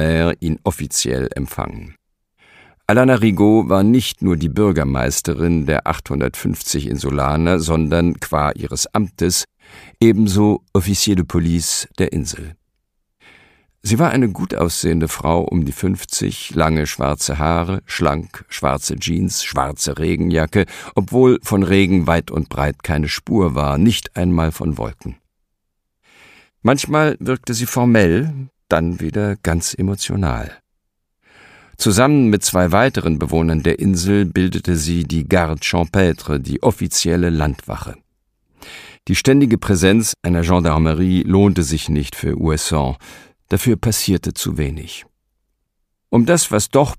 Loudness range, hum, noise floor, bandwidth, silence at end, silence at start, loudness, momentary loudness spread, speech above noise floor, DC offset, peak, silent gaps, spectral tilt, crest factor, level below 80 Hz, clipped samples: 5 LU; none; -73 dBFS; 15.5 kHz; 0 s; 0 s; -17 LUFS; 9 LU; 56 dB; under 0.1%; 0 dBFS; none; -5 dB/octave; 16 dB; -32 dBFS; under 0.1%